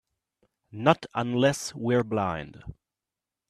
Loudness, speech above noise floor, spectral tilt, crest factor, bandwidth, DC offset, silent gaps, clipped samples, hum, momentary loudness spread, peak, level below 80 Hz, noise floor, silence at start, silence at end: -26 LUFS; 63 dB; -5.5 dB/octave; 24 dB; 14 kHz; under 0.1%; none; under 0.1%; none; 21 LU; -4 dBFS; -58 dBFS; -89 dBFS; 0.75 s; 0.75 s